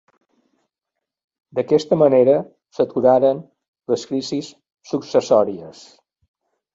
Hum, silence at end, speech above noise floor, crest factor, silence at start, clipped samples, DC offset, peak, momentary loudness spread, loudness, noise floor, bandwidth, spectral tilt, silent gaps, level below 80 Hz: none; 1.05 s; 65 dB; 18 dB; 1.55 s; under 0.1%; under 0.1%; -2 dBFS; 18 LU; -18 LUFS; -83 dBFS; 7.8 kHz; -6.5 dB/octave; 3.68-3.73 s; -64 dBFS